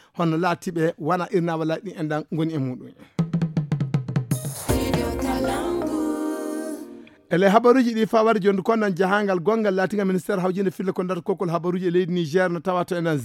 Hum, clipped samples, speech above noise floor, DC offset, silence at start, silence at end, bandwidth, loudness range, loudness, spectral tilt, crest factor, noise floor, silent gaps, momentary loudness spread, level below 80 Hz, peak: none; under 0.1%; 20 dB; under 0.1%; 0.15 s; 0 s; 17 kHz; 6 LU; -23 LUFS; -6.5 dB/octave; 20 dB; -42 dBFS; none; 9 LU; -44 dBFS; -2 dBFS